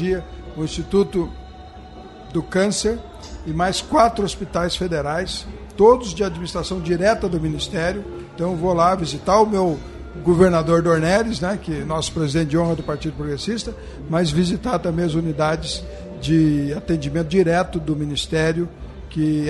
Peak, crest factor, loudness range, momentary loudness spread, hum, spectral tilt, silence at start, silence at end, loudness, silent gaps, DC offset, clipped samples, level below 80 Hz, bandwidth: -2 dBFS; 18 dB; 4 LU; 14 LU; none; -5.5 dB/octave; 0 s; 0 s; -20 LUFS; none; under 0.1%; under 0.1%; -38 dBFS; 11.5 kHz